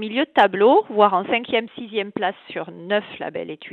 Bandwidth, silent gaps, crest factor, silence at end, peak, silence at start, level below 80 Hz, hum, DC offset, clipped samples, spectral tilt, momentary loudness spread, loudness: 4.4 kHz; none; 18 dB; 0 s; -2 dBFS; 0 s; -68 dBFS; none; under 0.1%; under 0.1%; -6.5 dB/octave; 15 LU; -20 LUFS